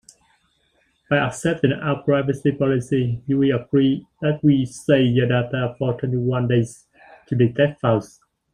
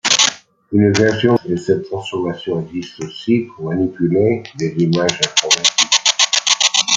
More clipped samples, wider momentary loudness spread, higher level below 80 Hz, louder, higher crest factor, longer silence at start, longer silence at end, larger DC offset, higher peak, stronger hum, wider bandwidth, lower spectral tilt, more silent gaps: neither; second, 6 LU vs 11 LU; about the same, -52 dBFS vs -56 dBFS; second, -21 LUFS vs -15 LUFS; about the same, 18 dB vs 16 dB; first, 1.1 s vs 0.05 s; first, 0.45 s vs 0 s; neither; second, -4 dBFS vs 0 dBFS; neither; about the same, 11.5 kHz vs 10.5 kHz; first, -7 dB/octave vs -3 dB/octave; neither